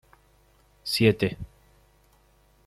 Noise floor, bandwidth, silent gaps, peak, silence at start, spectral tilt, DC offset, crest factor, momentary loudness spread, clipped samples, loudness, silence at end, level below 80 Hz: -61 dBFS; 14.5 kHz; none; -8 dBFS; 0.85 s; -5.5 dB/octave; under 0.1%; 22 dB; 21 LU; under 0.1%; -25 LUFS; 1.2 s; -54 dBFS